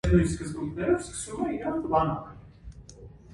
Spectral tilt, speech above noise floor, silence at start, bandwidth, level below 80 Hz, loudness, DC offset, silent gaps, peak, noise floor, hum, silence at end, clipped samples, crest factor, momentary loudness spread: -6.5 dB/octave; 21 dB; 0.05 s; 11.5 kHz; -40 dBFS; -28 LUFS; under 0.1%; none; -10 dBFS; -48 dBFS; none; 0 s; under 0.1%; 20 dB; 23 LU